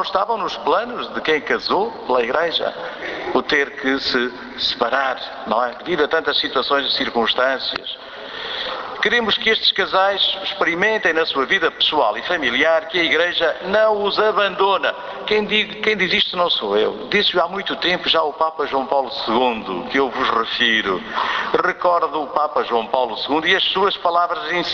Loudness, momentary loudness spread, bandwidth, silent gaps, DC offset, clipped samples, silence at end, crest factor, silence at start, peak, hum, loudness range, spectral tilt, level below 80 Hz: -18 LUFS; 6 LU; 7 kHz; none; under 0.1%; under 0.1%; 0 s; 18 dB; 0 s; -2 dBFS; none; 3 LU; -3.5 dB/octave; -54 dBFS